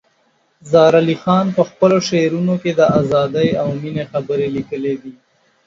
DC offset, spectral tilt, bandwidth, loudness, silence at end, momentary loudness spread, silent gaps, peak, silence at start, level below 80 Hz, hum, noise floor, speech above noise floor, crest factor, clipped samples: under 0.1%; -6.5 dB/octave; 7.6 kHz; -16 LUFS; 0.55 s; 10 LU; none; 0 dBFS; 0.65 s; -54 dBFS; none; -60 dBFS; 45 dB; 16 dB; under 0.1%